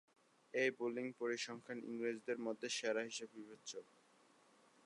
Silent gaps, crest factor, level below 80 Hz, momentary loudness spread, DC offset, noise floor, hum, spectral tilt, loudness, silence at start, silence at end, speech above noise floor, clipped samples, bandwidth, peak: none; 20 dB; under -90 dBFS; 13 LU; under 0.1%; -71 dBFS; none; -3 dB/octave; -43 LUFS; 0.55 s; 1 s; 28 dB; under 0.1%; 11.5 kHz; -26 dBFS